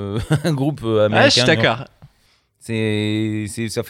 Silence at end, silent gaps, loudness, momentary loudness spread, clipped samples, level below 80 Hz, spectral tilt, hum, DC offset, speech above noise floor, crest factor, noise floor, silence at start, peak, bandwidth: 0 s; none; -18 LUFS; 12 LU; under 0.1%; -48 dBFS; -5 dB/octave; none; under 0.1%; 42 dB; 18 dB; -60 dBFS; 0 s; 0 dBFS; 15.5 kHz